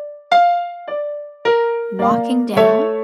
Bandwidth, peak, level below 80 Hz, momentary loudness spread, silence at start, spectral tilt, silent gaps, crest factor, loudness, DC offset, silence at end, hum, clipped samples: 13 kHz; -2 dBFS; -60 dBFS; 11 LU; 0 s; -6 dB/octave; none; 16 dB; -17 LUFS; under 0.1%; 0 s; none; under 0.1%